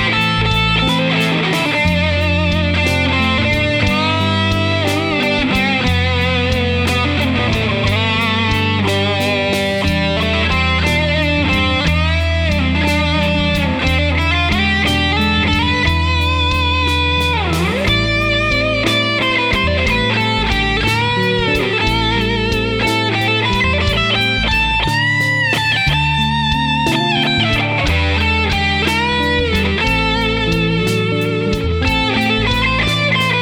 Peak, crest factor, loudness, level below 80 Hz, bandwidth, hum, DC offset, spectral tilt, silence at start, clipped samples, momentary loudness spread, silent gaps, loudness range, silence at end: 0 dBFS; 14 dB; -14 LUFS; -26 dBFS; 17 kHz; none; under 0.1%; -5 dB/octave; 0 s; under 0.1%; 2 LU; none; 1 LU; 0 s